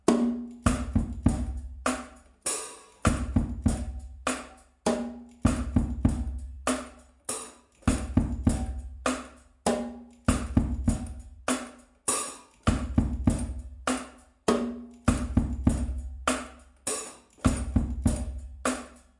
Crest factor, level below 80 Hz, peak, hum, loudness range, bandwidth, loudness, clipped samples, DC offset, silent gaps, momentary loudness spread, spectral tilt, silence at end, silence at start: 22 dB; -36 dBFS; -6 dBFS; none; 2 LU; 11.5 kHz; -30 LUFS; under 0.1%; under 0.1%; none; 10 LU; -5.5 dB/octave; 0.2 s; 0.05 s